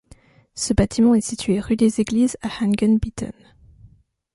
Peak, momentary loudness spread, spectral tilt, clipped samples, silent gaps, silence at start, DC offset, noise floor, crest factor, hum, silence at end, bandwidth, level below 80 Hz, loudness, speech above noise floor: -4 dBFS; 12 LU; -5.5 dB/octave; under 0.1%; none; 0.55 s; under 0.1%; -52 dBFS; 18 dB; none; 1.05 s; 11.5 kHz; -38 dBFS; -20 LUFS; 33 dB